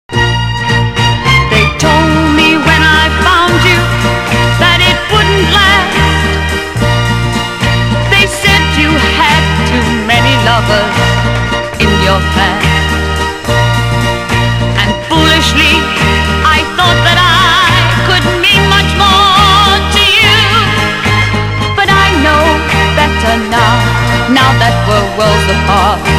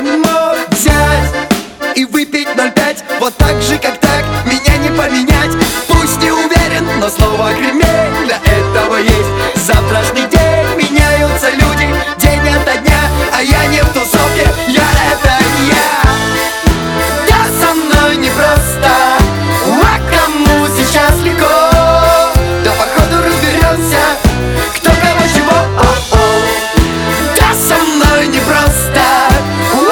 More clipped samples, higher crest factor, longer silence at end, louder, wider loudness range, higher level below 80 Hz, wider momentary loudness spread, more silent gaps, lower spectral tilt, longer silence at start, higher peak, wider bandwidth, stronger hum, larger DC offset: first, 0.7% vs 0.2%; about the same, 8 dB vs 10 dB; about the same, 0 s vs 0 s; about the same, -8 LUFS vs -10 LUFS; about the same, 3 LU vs 2 LU; about the same, -20 dBFS vs -18 dBFS; about the same, 6 LU vs 4 LU; neither; about the same, -4.5 dB/octave vs -4.5 dB/octave; about the same, 0.1 s vs 0 s; about the same, 0 dBFS vs 0 dBFS; second, 16 kHz vs over 20 kHz; neither; neither